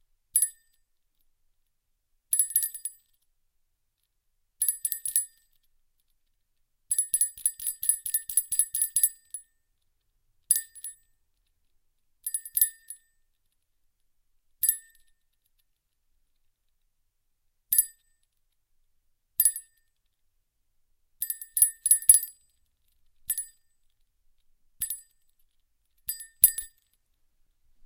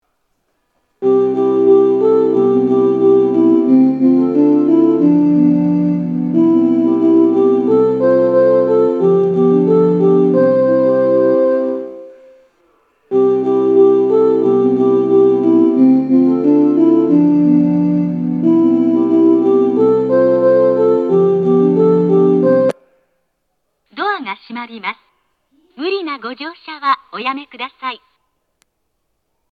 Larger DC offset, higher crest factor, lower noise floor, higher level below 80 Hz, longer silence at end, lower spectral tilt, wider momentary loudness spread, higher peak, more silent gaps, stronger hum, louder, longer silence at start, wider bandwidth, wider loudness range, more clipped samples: neither; first, 32 dB vs 12 dB; first, -77 dBFS vs -70 dBFS; about the same, -66 dBFS vs -64 dBFS; second, 1.2 s vs 1.55 s; second, 3 dB/octave vs -9.5 dB/octave; first, 20 LU vs 11 LU; about the same, 0 dBFS vs 0 dBFS; neither; neither; second, -25 LUFS vs -12 LUFS; second, 0.35 s vs 1 s; first, 17 kHz vs 5 kHz; about the same, 10 LU vs 11 LU; neither